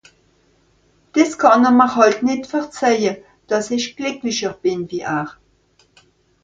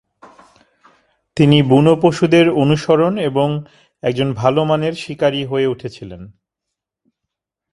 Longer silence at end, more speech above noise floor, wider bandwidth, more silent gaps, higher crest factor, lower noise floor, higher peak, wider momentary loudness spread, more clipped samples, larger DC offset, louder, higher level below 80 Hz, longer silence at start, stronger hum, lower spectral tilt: second, 1.15 s vs 1.45 s; second, 41 dB vs 66 dB; second, 7.8 kHz vs 11.5 kHz; neither; about the same, 18 dB vs 16 dB; second, -58 dBFS vs -81 dBFS; about the same, 0 dBFS vs 0 dBFS; second, 12 LU vs 15 LU; neither; neither; about the same, -17 LUFS vs -15 LUFS; second, -60 dBFS vs -52 dBFS; second, 1.15 s vs 1.35 s; neither; second, -4 dB/octave vs -7 dB/octave